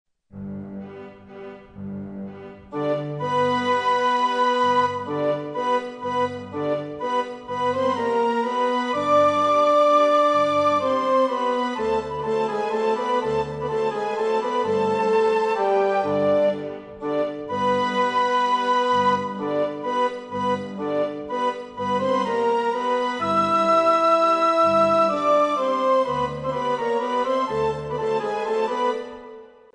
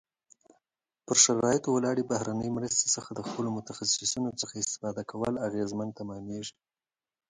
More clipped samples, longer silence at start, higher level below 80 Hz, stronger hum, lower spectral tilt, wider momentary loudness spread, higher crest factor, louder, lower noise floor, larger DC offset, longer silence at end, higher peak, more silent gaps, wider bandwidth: neither; second, 0.35 s vs 1.1 s; first, -58 dBFS vs -64 dBFS; neither; first, -5.5 dB/octave vs -3 dB/octave; second, 13 LU vs 16 LU; second, 14 dB vs 24 dB; first, -22 LUFS vs -29 LUFS; second, -43 dBFS vs -82 dBFS; neither; second, 0.3 s vs 0.8 s; about the same, -8 dBFS vs -8 dBFS; neither; about the same, 10 kHz vs 11 kHz